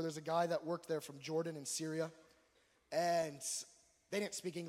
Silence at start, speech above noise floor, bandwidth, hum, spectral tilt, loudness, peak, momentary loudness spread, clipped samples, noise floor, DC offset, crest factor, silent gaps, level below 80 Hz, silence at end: 0 s; 34 dB; 16 kHz; none; -4 dB/octave; -40 LUFS; -24 dBFS; 7 LU; under 0.1%; -74 dBFS; under 0.1%; 18 dB; none; -86 dBFS; 0 s